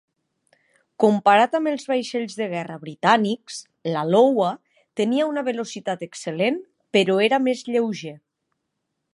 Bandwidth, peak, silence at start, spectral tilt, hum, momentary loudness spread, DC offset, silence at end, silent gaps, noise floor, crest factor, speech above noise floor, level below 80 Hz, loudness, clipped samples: 11.5 kHz; -2 dBFS; 1 s; -5 dB/octave; none; 14 LU; under 0.1%; 1 s; none; -78 dBFS; 20 dB; 57 dB; -76 dBFS; -22 LUFS; under 0.1%